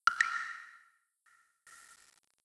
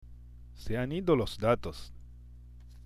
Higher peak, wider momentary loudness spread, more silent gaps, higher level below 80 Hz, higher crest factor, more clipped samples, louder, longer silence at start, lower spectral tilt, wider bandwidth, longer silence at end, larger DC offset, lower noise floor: about the same, -12 dBFS vs -14 dBFS; about the same, 27 LU vs 25 LU; neither; second, -84 dBFS vs -46 dBFS; first, 26 dB vs 20 dB; neither; second, -34 LUFS vs -31 LUFS; about the same, 0.05 s vs 0 s; second, 2.5 dB/octave vs -7 dB/octave; second, 11 kHz vs 15.5 kHz; first, 0.5 s vs 0 s; neither; first, -70 dBFS vs -50 dBFS